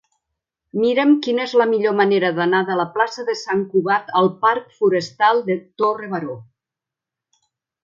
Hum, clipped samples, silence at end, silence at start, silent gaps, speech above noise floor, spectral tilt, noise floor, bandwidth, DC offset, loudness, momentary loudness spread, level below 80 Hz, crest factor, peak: none; under 0.1%; 1.4 s; 0.75 s; none; 68 dB; -6 dB/octave; -87 dBFS; 7.6 kHz; under 0.1%; -19 LUFS; 9 LU; -70 dBFS; 16 dB; -4 dBFS